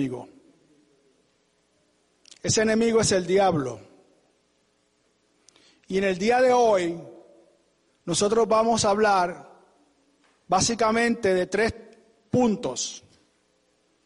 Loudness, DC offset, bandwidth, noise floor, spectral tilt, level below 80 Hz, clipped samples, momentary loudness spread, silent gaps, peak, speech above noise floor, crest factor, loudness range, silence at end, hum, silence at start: -23 LUFS; under 0.1%; 11.5 kHz; -68 dBFS; -4 dB/octave; -56 dBFS; under 0.1%; 13 LU; none; -10 dBFS; 46 dB; 16 dB; 4 LU; 1.1 s; none; 0 s